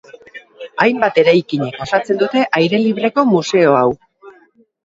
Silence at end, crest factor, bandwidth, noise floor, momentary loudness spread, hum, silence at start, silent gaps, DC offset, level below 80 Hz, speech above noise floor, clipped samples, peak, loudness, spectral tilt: 0.55 s; 16 dB; 7.8 kHz; -51 dBFS; 9 LU; none; 0.35 s; none; under 0.1%; -56 dBFS; 37 dB; under 0.1%; 0 dBFS; -14 LUFS; -6 dB/octave